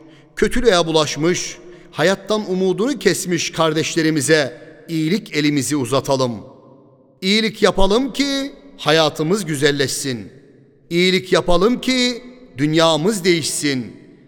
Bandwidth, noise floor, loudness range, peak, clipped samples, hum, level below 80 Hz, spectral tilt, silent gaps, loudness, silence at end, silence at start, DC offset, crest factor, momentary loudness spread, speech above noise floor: 19 kHz; -49 dBFS; 2 LU; 0 dBFS; under 0.1%; none; -36 dBFS; -4 dB/octave; none; -18 LUFS; 0.3 s; 0.35 s; under 0.1%; 18 dB; 10 LU; 32 dB